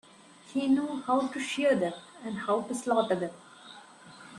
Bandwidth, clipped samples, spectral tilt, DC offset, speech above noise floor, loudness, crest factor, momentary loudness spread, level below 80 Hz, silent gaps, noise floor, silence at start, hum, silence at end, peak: 12 kHz; under 0.1%; -5 dB/octave; under 0.1%; 25 dB; -30 LUFS; 16 dB; 22 LU; -74 dBFS; none; -54 dBFS; 0.45 s; none; 0 s; -14 dBFS